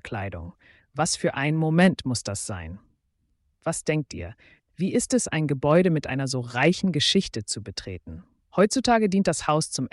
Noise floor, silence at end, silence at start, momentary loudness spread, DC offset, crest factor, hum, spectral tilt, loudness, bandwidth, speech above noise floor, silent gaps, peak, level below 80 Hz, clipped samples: -71 dBFS; 0.05 s; 0.05 s; 17 LU; under 0.1%; 16 dB; none; -4.5 dB/octave; -24 LUFS; 11.5 kHz; 47 dB; none; -8 dBFS; -52 dBFS; under 0.1%